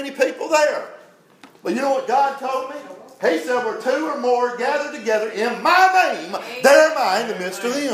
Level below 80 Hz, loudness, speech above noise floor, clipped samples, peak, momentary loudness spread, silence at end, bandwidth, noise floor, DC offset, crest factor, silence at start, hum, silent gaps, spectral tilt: -84 dBFS; -19 LUFS; 30 dB; under 0.1%; 0 dBFS; 13 LU; 0 s; 16 kHz; -49 dBFS; under 0.1%; 20 dB; 0 s; none; none; -2.5 dB/octave